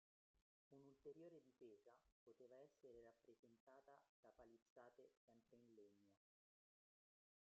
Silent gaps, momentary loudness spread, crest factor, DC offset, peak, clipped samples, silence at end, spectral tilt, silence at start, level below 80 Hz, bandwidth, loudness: 0.42-0.71 s, 2.12-2.26 s, 3.39-3.43 s, 3.60-3.67 s, 4.09-4.23 s, 4.62-4.76 s, 5.17-5.28 s; 5 LU; 20 dB; under 0.1%; -52 dBFS; under 0.1%; 1.3 s; -6 dB/octave; 0.35 s; under -90 dBFS; 6.8 kHz; -67 LUFS